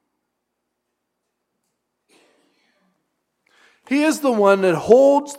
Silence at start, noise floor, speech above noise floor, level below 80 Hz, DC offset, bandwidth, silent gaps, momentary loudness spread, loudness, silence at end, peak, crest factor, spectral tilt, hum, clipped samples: 3.9 s; -77 dBFS; 62 dB; -66 dBFS; under 0.1%; 16 kHz; none; 7 LU; -16 LUFS; 0 s; 0 dBFS; 20 dB; -5.5 dB/octave; none; under 0.1%